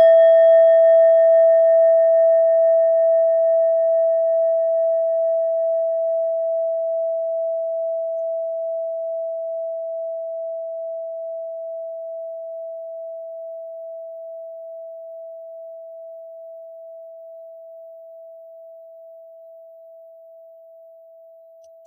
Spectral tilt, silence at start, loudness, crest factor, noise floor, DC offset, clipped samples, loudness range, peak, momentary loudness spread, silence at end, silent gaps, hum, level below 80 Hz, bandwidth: -1.5 dB/octave; 0 s; -18 LUFS; 14 dB; -46 dBFS; under 0.1%; under 0.1%; 24 LU; -6 dBFS; 25 LU; 2.25 s; none; none; under -90 dBFS; 3.5 kHz